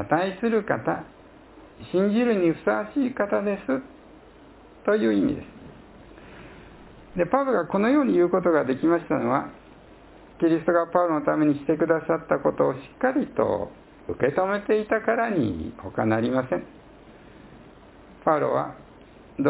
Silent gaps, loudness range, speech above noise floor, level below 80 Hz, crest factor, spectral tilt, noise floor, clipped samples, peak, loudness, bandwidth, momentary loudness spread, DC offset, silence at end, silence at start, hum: none; 5 LU; 26 dB; -54 dBFS; 18 dB; -11 dB/octave; -49 dBFS; under 0.1%; -6 dBFS; -24 LUFS; 4 kHz; 11 LU; under 0.1%; 0 s; 0 s; none